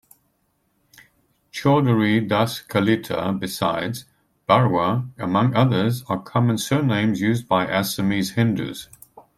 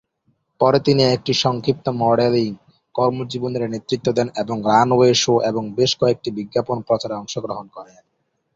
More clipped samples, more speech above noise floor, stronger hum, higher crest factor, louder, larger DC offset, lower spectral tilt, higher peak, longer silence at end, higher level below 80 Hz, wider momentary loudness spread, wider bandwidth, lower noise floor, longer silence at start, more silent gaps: neither; about the same, 48 dB vs 48 dB; neither; about the same, 18 dB vs 18 dB; about the same, -21 LUFS vs -19 LUFS; neither; about the same, -6 dB/octave vs -5 dB/octave; about the same, -4 dBFS vs -2 dBFS; second, 0.15 s vs 0.7 s; about the same, -58 dBFS vs -56 dBFS; second, 9 LU vs 12 LU; first, 15 kHz vs 7.8 kHz; about the same, -68 dBFS vs -66 dBFS; first, 1.55 s vs 0.6 s; neither